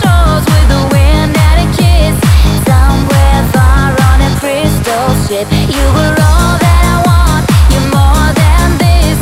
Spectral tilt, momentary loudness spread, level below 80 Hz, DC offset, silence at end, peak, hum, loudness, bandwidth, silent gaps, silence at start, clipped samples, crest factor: -5.5 dB/octave; 3 LU; -10 dBFS; under 0.1%; 0 s; 0 dBFS; none; -9 LUFS; 16 kHz; none; 0 s; 2%; 6 dB